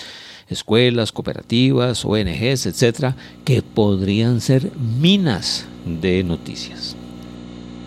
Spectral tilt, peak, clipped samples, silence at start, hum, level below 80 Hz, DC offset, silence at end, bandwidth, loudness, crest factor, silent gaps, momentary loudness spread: -5.5 dB/octave; -2 dBFS; under 0.1%; 0 s; 60 Hz at -35 dBFS; -44 dBFS; under 0.1%; 0 s; 14 kHz; -19 LUFS; 18 dB; none; 17 LU